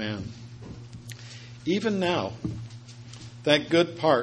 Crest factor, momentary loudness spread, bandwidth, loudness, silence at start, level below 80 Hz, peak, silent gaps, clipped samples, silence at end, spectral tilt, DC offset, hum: 24 dB; 21 LU; 10 kHz; -26 LUFS; 0 s; -56 dBFS; -4 dBFS; none; under 0.1%; 0 s; -5.5 dB/octave; under 0.1%; none